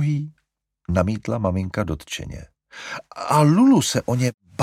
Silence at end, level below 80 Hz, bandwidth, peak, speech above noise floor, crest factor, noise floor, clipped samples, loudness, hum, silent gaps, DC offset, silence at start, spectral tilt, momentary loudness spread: 0 s; -44 dBFS; 15.5 kHz; -2 dBFS; 49 dB; 18 dB; -69 dBFS; under 0.1%; -21 LUFS; none; 4.34-4.38 s; under 0.1%; 0 s; -6 dB/octave; 21 LU